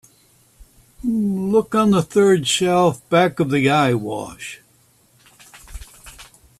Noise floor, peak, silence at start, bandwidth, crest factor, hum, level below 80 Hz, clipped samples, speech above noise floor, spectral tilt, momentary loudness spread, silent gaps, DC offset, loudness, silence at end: -56 dBFS; -2 dBFS; 0.6 s; 14 kHz; 18 dB; none; -48 dBFS; under 0.1%; 39 dB; -5 dB/octave; 18 LU; none; under 0.1%; -18 LUFS; 0.35 s